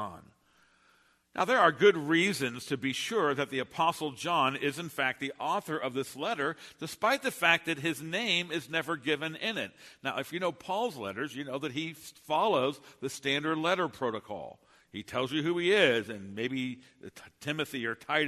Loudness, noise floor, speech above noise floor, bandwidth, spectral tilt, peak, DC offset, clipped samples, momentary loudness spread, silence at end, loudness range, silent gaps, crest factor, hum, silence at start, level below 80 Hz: -30 LUFS; -67 dBFS; 36 dB; 13.5 kHz; -4 dB/octave; -8 dBFS; under 0.1%; under 0.1%; 15 LU; 0 s; 5 LU; none; 22 dB; none; 0 s; -74 dBFS